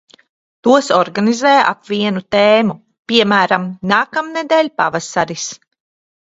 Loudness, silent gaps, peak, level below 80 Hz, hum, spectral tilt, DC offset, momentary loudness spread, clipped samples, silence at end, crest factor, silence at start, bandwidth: -14 LUFS; 2.99-3.03 s; 0 dBFS; -58 dBFS; none; -4 dB/octave; under 0.1%; 9 LU; under 0.1%; 0.65 s; 16 dB; 0.65 s; 8 kHz